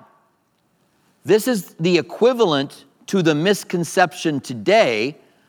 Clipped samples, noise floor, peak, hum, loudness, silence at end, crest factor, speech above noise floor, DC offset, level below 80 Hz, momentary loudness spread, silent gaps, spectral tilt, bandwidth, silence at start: under 0.1%; -64 dBFS; 0 dBFS; none; -19 LUFS; 0.35 s; 20 dB; 46 dB; under 0.1%; -74 dBFS; 8 LU; none; -5 dB/octave; 20 kHz; 1.25 s